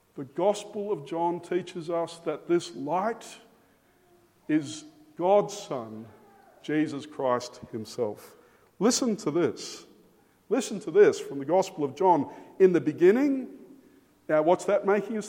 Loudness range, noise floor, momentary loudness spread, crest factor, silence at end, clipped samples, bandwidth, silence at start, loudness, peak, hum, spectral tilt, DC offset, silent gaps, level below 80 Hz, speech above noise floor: 8 LU; -63 dBFS; 16 LU; 20 dB; 0 s; under 0.1%; 16 kHz; 0.15 s; -27 LUFS; -8 dBFS; none; -5 dB/octave; under 0.1%; none; -76 dBFS; 36 dB